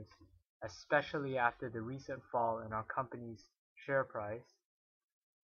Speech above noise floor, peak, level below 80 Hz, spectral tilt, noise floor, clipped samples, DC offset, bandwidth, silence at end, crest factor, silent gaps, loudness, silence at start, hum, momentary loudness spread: 20 dB; -16 dBFS; -72 dBFS; -6 dB/octave; -59 dBFS; under 0.1%; under 0.1%; 7.2 kHz; 1 s; 24 dB; 0.46-0.60 s, 3.58-3.76 s; -39 LUFS; 0 s; none; 16 LU